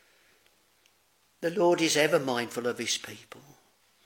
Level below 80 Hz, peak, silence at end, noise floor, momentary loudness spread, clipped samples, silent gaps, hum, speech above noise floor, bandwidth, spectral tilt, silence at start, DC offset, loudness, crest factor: -80 dBFS; -10 dBFS; 0.65 s; -68 dBFS; 12 LU; under 0.1%; none; none; 40 dB; 17 kHz; -3 dB/octave; 1.4 s; under 0.1%; -27 LUFS; 20 dB